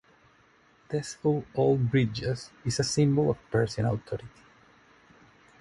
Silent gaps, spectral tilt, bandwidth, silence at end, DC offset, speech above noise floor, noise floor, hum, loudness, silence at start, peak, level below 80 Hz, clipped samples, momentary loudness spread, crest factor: none; -6 dB/octave; 11.5 kHz; 1.3 s; under 0.1%; 34 dB; -61 dBFS; none; -28 LUFS; 0.9 s; -12 dBFS; -54 dBFS; under 0.1%; 10 LU; 18 dB